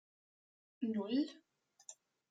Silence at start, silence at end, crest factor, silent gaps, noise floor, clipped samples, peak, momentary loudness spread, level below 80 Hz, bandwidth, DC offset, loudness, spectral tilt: 0.8 s; 0.4 s; 18 dB; none; -61 dBFS; under 0.1%; -26 dBFS; 19 LU; under -90 dBFS; 9.4 kHz; under 0.1%; -39 LUFS; -5.5 dB/octave